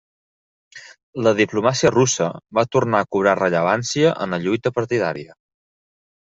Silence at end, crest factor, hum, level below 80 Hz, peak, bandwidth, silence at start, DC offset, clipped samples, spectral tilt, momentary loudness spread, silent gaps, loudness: 1.1 s; 18 dB; none; -58 dBFS; -2 dBFS; 8 kHz; 0.75 s; under 0.1%; under 0.1%; -4.5 dB/octave; 6 LU; 1.03-1.13 s; -19 LUFS